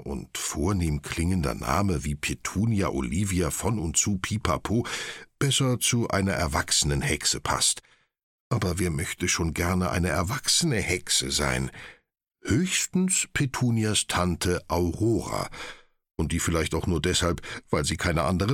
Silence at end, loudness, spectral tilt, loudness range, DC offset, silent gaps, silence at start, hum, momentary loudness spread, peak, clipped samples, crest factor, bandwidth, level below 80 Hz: 0 s; -26 LUFS; -4 dB/octave; 2 LU; under 0.1%; 8.23-8.51 s; 0 s; none; 8 LU; -6 dBFS; under 0.1%; 20 dB; 17 kHz; -40 dBFS